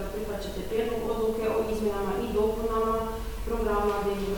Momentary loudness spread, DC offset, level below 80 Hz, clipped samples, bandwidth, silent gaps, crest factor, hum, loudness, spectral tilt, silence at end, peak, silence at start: 7 LU; under 0.1%; -38 dBFS; under 0.1%; 19 kHz; none; 14 dB; none; -29 LUFS; -6 dB/octave; 0 s; -14 dBFS; 0 s